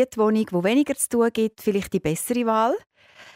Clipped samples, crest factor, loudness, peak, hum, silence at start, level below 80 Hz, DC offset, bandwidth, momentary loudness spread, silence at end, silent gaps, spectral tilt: under 0.1%; 14 dB; -22 LUFS; -8 dBFS; none; 0 s; -56 dBFS; under 0.1%; 16 kHz; 4 LU; 0.05 s; none; -5 dB/octave